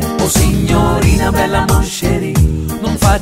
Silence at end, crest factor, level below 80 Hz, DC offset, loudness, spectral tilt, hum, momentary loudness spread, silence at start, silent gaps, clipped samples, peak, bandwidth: 0 s; 12 dB; -18 dBFS; under 0.1%; -13 LUFS; -5 dB/octave; none; 4 LU; 0 s; none; under 0.1%; 0 dBFS; 16.5 kHz